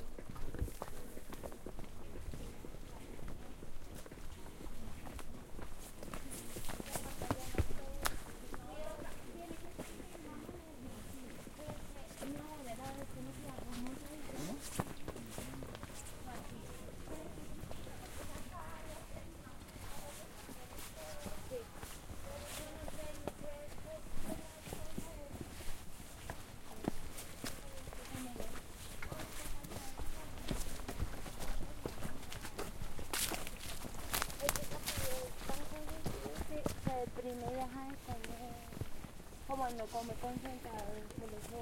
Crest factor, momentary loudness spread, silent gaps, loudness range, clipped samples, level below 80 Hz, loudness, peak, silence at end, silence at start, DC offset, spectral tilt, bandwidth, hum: 32 dB; 11 LU; none; 9 LU; under 0.1%; -50 dBFS; -46 LUFS; -10 dBFS; 0 s; 0 s; under 0.1%; -4 dB/octave; 16.5 kHz; none